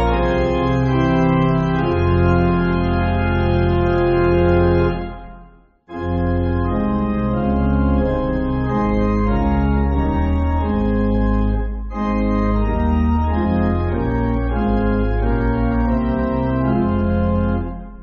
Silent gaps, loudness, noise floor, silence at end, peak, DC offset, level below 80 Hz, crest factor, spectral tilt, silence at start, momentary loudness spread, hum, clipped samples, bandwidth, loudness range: none; -18 LUFS; -45 dBFS; 0 s; -4 dBFS; under 0.1%; -24 dBFS; 14 dB; -7.5 dB/octave; 0 s; 5 LU; none; under 0.1%; 6.6 kHz; 2 LU